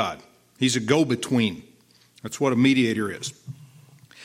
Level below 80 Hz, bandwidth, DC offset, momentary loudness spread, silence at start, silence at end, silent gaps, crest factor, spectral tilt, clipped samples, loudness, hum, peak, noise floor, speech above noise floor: -66 dBFS; 15.5 kHz; under 0.1%; 22 LU; 0 s; 0 s; none; 20 dB; -5 dB/octave; under 0.1%; -23 LUFS; none; -4 dBFS; -57 dBFS; 34 dB